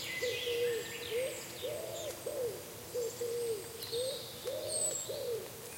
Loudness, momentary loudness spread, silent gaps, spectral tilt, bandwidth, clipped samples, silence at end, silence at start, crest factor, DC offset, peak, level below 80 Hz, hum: -38 LUFS; 7 LU; none; -1.5 dB/octave; 16.5 kHz; under 0.1%; 0 s; 0 s; 14 dB; under 0.1%; -24 dBFS; -70 dBFS; none